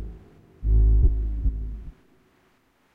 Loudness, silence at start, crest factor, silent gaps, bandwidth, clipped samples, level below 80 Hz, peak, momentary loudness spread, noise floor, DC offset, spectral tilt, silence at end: -25 LUFS; 0 s; 16 dB; none; 1.1 kHz; under 0.1%; -24 dBFS; -8 dBFS; 21 LU; -64 dBFS; under 0.1%; -11 dB/octave; 1.05 s